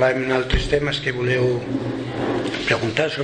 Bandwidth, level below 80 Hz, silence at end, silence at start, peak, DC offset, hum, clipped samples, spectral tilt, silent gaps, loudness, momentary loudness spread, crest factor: 9.8 kHz; -34 dBFS; 0 s; 0 s; -4 dBFS; under 0.1%; none; under 0.1%; -5.5 dB/octave; none; -21 LUFS; 6 LU; 16 dB